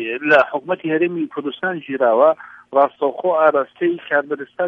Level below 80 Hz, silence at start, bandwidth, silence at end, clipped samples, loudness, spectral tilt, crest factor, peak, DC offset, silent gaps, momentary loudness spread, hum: -68 dBFS; 0 s; 6 kHz; 0 s; under 0.1%; -18 LUFS; -7 dB/octave; 18 dB; 0 dBFS; under 0.1%; none; 10 LU; none